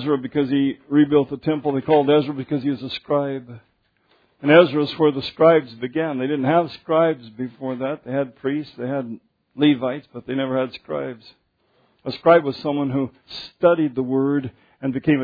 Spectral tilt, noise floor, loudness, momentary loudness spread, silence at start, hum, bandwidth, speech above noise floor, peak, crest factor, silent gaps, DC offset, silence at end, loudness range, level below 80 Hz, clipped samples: -9 dB/octave; -63 dBFS; -21 LUFS; 14 LU; 0 s; none; 5 kHz; 43 dB; 0 dBFS; 20 dB; none; under 0.1%; 0 s; 6 LU; -62 dBFS; under 0.1%